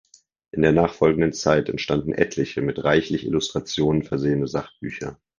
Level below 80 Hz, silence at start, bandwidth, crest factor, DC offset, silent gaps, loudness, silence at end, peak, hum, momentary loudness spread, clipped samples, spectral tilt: -46 dBFS; 0.55 s; 9.8 kHz; 20 dB; under 0.1%; none; -22 LUFS; 0.25 s; -2 dBFS; none; 11 LU; under 0.1%; -6 dB/octave